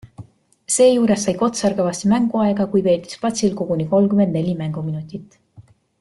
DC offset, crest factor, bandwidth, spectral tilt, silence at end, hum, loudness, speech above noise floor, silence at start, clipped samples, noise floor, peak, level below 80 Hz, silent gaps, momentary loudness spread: under 0.1%; 16 dB; 12 kHz; -5.5 dB/octave; 0.4 s; none; -18 LUFS; 30 dB; 0.05 s; under 0.1%; -48 dBFS; -4 dBFS; -56 dBFS; none; 11 LU